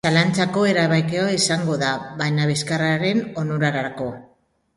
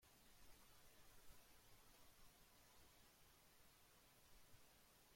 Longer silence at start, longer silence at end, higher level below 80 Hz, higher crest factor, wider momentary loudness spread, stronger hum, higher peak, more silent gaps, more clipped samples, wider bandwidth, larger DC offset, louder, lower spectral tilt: about the same, 0.05 s vs 0 s; first, 0.5 s vs 0 s; first, -58 dBFS vs -78 dBFS; about the same, 18 dB vs 16 dB; first, 8 LU vs 1 LU; neither; first, -2 dBFS vs -52 dBFS; neither; neither; second, 11.5 kHz vs 16.5 kHz; neither; first, -21 LUFS vs -70 LUFS; first, -5 dB/octave vs -2.5 dB/octave